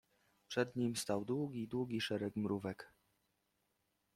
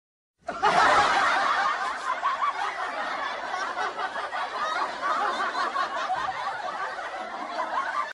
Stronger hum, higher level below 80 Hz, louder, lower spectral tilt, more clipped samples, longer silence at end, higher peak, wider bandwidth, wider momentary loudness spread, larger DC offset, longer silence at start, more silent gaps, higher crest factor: neither; second, -76 dBFS vs -62 dBFS; second, -40 LUFS vs -26 LUFS; first, -5 dB/octave vs -2 dB/octave; neither; first, 1.3 s vs 0 s; second, -22 dBFS vs -10 dBFS; first, 15.5 kHz vs 11.5 kHz; second, 7 LU vs 11 LU; neither; about the same, 0.5 s vs 0.45 s; neither; about the same, 20 dB vs 18 dB